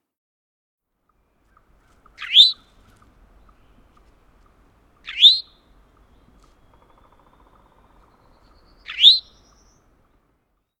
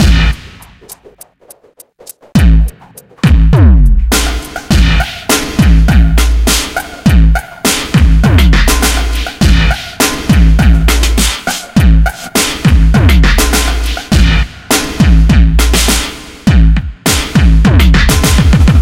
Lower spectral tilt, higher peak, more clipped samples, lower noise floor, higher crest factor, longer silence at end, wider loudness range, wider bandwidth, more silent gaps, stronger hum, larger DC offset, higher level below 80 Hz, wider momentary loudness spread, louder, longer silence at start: second, 1.5 dB/octave vs -4.5 dB/octave; about the same, 0 dBFS vs 0 dBFS; second, under 0.1% vs 0.2%; first, -69 dBFS vs -41 dBFS; first, 24 dB vs 8 dB; first, 1.6 s vs 0 s; about the same, 0 LU vs 2 LU; first, 19 kHz vs 16.5 kHz; neither; neither; neither; second, -58 dBFS vs -10 dBFS; first, 23 LU vs 6 LU; about the same, -12 LUFS vs -10 LUFS; first, 2.2 s vs 0 s